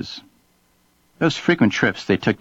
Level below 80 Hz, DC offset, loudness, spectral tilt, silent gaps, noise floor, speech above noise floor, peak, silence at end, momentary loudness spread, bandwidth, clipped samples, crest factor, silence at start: -54 dBFS; under 0.1%; -19 LUFS; -5.5 dB/octave; none; -61 dBFS; 42 dB; -4 dBFS; 0.05 s; 13 LU; 8 kHz; under 0.1%; 18 dB; 0 s